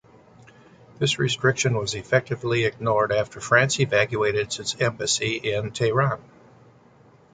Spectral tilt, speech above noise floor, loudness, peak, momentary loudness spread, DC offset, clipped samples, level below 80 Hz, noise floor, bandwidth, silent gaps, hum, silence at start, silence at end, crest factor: -4 dB/octave; 31 dB; -23 LUFS; -4 dBFS; 6 LU; under 0.1%; under 0.1%; -56 dBFS; -54 dBFS; 9.6 kHz; none; none; 1 s; 1.15 s; 20 dB